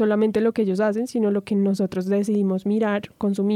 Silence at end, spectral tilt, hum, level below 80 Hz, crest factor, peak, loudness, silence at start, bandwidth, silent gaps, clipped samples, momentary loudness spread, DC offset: 0 s; -7.5 dB/octave; none; -62 dBFS; 10 dB; -10 dBFS; -22 LUFS; 0 s; 12 kHz; none; under 0.1%; 4 LU; under 0.1%